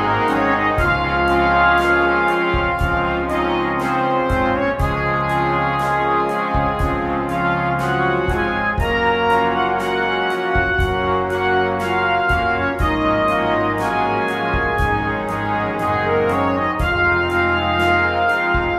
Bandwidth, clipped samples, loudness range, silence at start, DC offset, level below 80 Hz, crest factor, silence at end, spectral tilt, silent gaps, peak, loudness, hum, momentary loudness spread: 15 kHz; under 0.1%; 2 LU; 0 s; under 0.1%; -30 dBFS; 16 dB; 0 s; -6.5 dB/octave; none; -2 dBFS; -18 LUFS; none; 4 LU